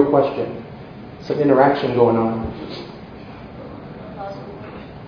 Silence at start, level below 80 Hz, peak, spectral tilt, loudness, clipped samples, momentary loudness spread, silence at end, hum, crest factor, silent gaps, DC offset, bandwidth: 0 s; -46 dBFS; 0 dBFS; -9 dB/octave; -18 LUFS; under 0.1%; 21 LU; 0 s; none; 20 dB; none; under 0.1%; 5.4 kHz